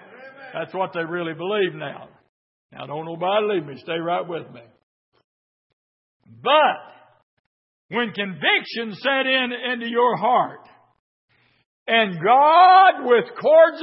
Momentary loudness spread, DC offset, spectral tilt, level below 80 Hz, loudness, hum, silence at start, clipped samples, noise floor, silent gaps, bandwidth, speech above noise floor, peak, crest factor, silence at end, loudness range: 18 LU; under 0.1%; -9 dB/octave; -78 dBFS; -19 LUFS; none; 0.2 s; under 0.1%; -42 dBFS; 2.29-2.69 s, 4.83-5.12 s, 5.24-6.20 s, 7.23-7.89 s, 10.99-11.28 s, 11.66-11.86 s; 5.8 kHz; 23 dB; -2 dBFS; 18 dB; 0 s; 10 LU